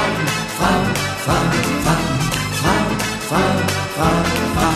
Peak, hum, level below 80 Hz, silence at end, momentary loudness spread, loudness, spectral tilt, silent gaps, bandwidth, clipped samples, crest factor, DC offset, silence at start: -2 dBFS; none; -34 dBFS; 0 s; 3 LU; -18 LUFS; -4.5 dB/octave; none; 14 kHz; under 0.1%; 16 dB; under 0.1%; 0 s